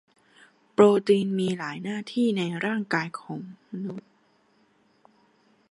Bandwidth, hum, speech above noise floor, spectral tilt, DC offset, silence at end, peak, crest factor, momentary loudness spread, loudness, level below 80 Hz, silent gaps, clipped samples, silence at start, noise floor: 11 kHz; none; 40 dB; -6.5 dB/octave; under 0.1%; 1.7 s; -4 dBFS; 22 dB; 18 LU; -25 LUFS; -72 dBFS; none; under 0.1%; 0.8 s; -64 dBFS